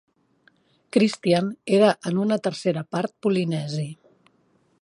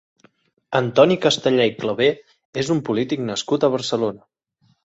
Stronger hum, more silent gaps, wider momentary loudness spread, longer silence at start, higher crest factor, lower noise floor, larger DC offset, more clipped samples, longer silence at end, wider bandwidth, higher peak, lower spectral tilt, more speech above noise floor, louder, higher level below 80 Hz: neither; second, none vs 2.45-2.53 s; about the same, 9 LU vs 9 LU; first, 0.95 s vs 0.7 s; about the same, 20 dB vs 20 dB; about the same, -64 dBFS vs -63 dBFS; neither; neither; first, 0.9 s vs 0.7 s; first, 11.5 kHz vs 8.2 kHz; about the same, -4 dBFS vs -2 dBFS; first, -6.5 dB/octave vs -5 dB/octave; about the same, 42 dB vs 44 dB; second, -23 LUFS vs -20 LUFS; second, -68 dBFS vs -60 dBFS